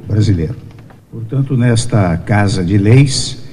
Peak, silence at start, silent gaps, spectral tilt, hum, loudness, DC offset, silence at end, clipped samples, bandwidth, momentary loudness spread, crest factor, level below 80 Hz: 0 dBFS; 0 s; none; -6 dB/octave; none; -13 LUFS; under 0.1%; 0 s; 0.2%; 11.5 kHz; 14 LU; 12 dB; -36 dBFS